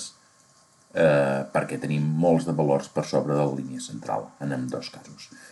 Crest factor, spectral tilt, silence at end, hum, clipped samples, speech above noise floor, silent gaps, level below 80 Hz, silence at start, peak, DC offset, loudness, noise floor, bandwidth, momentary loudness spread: 18 dB; -6.5 dB/octave; 0.05 s; none; under 0.1%; 33 dB; none; -66 dBFS; 0 s; -8 dBFS; under 0.1%; -25 LUFS; -58 dBFS; 12 kHz; 15 LU